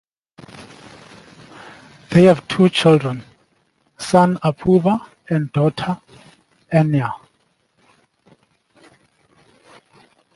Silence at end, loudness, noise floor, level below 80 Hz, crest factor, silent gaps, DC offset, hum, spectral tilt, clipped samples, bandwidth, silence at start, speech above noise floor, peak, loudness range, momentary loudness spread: 3.2 s; -17 LUFS; -64 dBFS; -54 dBFS; 18 dB; none; under 0.1%; none; -7 dB/octave; under 0.1%; 11.5 kHz; 0.55 s; 48 dB; -2 dBFS; 9 LU; 27 LU